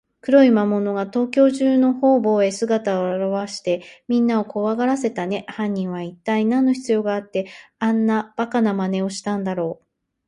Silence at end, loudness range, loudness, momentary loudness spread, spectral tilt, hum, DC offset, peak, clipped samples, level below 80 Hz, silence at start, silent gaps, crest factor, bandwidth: 0.55 s; 4 LU; -20 LUFS; 10 LU; -6.5 dB/octave; none; under 0.1%; -2 dBFS; under 0.1%; -66 dBFS; 0.25 s; none; 18 dB; 10.5 kHz